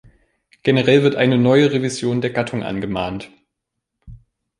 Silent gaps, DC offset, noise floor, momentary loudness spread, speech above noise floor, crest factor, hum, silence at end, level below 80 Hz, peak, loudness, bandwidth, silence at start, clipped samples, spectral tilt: none; under 0.1%; -79 dBFS; 10 LU; 62 dB; 18 dB; none; 0.45 s; -50 dBFS; -2 dBFS; -18 LUFS; 11.5 kHz; 0.65 s; under 0.1%; -6 dB/octave